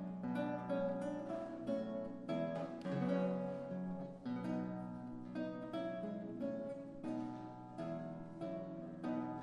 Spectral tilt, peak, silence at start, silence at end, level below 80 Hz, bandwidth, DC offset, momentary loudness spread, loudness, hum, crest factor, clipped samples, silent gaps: -8.5 dB/octave; -26 dBFS; 0 s; 0 s; -72 dBFS; 10.5 kHz; under 0.1%; 8 LU; -43 LUFS; none; 16 dB; under 0.1%; none